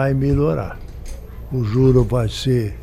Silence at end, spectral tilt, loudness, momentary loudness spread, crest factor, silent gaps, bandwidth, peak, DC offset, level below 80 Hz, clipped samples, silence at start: 0 s; -7.5 dB/octave; -18 LUFS; 21 LU; 14 dB; none; 14 kHz; -4 dBFS; under 0.1%; -30 dBFS; under 0.1%; 0 s